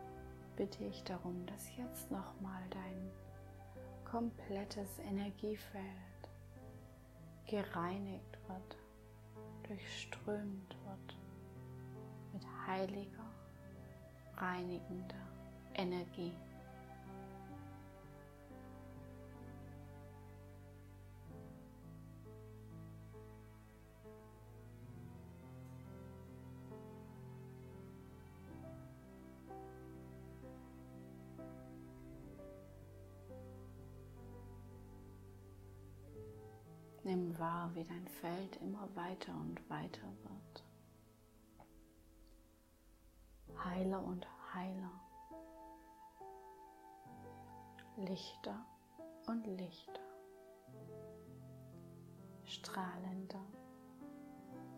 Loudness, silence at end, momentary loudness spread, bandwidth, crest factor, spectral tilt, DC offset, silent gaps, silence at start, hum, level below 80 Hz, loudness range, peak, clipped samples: -50 LUFS; 0 s; 16 LU; 16 kHz; 22 dB; -6 dB/octave; under 0.1%; none; 0 s; none; -66 dBFS; 10 LU; -26 dBFS; under 0.1%